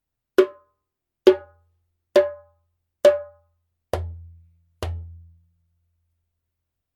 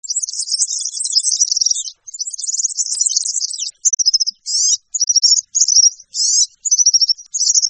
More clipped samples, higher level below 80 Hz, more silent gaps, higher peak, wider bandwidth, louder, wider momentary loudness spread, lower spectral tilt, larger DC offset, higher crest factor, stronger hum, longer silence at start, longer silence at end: neither; first, -46 dBFS vs -76 dBFS; neither; about the same, 0 dBFS vs 0 dBFS; first, 15 kHz vs 9.6 kHz; second, -22 LUFS vs -13 LUFS; first, 18 LU vs 9 LU; first, -6 dB/octave vs 8.5 dB/octave; neither; first, 24 dB vs 16 dB; neither; first, 0.4 s vs 0.05 s; first, 1.85 s vs 0 s